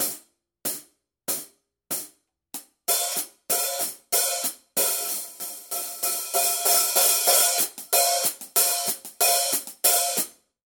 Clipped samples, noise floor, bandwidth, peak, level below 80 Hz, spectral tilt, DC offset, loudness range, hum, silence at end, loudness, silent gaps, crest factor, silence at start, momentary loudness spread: under 0.1%; -53 dBFS; 18 kHz; -4 dBFS; -74 dBFS; 1.5 dB/octave; under 0.1%; 8 LU; none; 0.35 s; -22 LUFS; none; 20 dB; 0 s; 14 LU